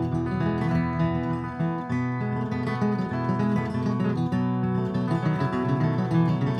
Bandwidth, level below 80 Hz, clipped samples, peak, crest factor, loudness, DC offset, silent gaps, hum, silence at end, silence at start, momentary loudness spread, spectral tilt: 8.8 kHz; -50 dBFS; under 0.1%; -10 dBFS; 14 dB; -26 LUFS; under 0.1%; none; none; 0 s; 0 s; 4 LU; -9 dB/octave